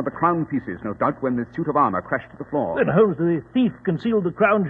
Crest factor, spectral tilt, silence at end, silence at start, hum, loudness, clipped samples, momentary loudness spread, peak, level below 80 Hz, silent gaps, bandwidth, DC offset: 18 dB; -10 dB/octave; 0 s; 0 s; none; -22 LUFS; under 0.1%; 9 LU; -4 dBFS; -54 dBFS; none; 4.6 kHz; under 0.1%